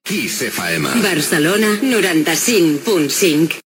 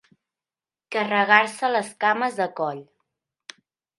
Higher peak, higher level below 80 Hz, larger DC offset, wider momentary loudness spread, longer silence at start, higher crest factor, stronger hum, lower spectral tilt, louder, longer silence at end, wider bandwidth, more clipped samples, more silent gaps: about the same, -2 dBFS vs 0 dBFS; first, -60 dBFS vs -78 dBFS; neither; second, 5 LU vs 13 LU; second, 0.05 s vs 0.9 s; second, 14 dB vs 24 dB; neither; about the same, -3.5 dB/octave vs -3.5 dB/octave; first, -15 LUFS vs -22 LUFS; second, 0.1 s vs 1.15 s; first, 19 kHz vs 11.5 kHz; neither; neither